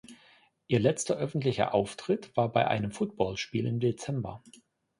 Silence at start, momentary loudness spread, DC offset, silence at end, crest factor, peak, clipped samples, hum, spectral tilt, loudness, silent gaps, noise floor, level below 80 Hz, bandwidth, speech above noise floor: 0.1 s; 8 LU; under 0.1%; 0.6 s; 20 dB; -10 dBFS; under 0.1%; none; -5.5 dB/octave; -30 LUFS; none; -62 dBFS; -60 dBFS; 11.5 kHz; 33 dB